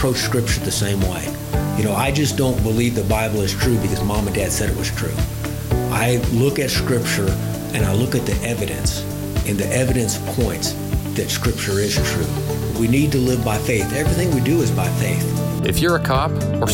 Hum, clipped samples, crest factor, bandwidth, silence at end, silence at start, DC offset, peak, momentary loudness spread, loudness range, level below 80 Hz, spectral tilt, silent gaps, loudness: none; under 0.1%; 12 dB; 17 kHz; 0 s; 0 s; under 0.1%; -6 dBFS; 5 LU; 2 LU; -30 dBFS; -5 dB/octave; none; -19 LUFS